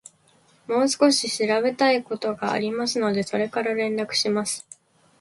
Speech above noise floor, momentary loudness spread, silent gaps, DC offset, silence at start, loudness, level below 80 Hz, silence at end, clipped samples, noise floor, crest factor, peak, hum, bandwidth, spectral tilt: 37 dB; 7 LU; none; under 0.1%; 0.7 s; -23 LUFS; -68 dBFS; 0.6 s; under 0.1%; -59 dBFS; 18 dB; -6 dBFS; none; 11.5 kHz; -3 dB/octave